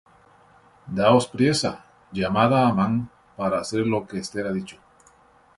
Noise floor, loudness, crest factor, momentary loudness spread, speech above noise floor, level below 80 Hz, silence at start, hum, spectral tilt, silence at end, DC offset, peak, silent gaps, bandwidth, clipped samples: -56 dBFS; -23 LUFS; 20 dB; 14 LU; 34 dB; -54 dBFS; 0.85 s; none; -5.5 dB/octave; 0.85 s; under 0.1%; -4 dBFS; none; 11.5 kHz; under 0.1%